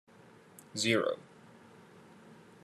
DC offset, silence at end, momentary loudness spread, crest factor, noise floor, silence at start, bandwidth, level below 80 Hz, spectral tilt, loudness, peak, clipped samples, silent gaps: under 0.1%; 0.3 s; 27 LU; 22 dB; -58 dBFS; 0.75 s; 13 kHz; -84 dBFS; -3.5 dB/octave; -32 LUFS; -16 dBFS; under 0.1%; none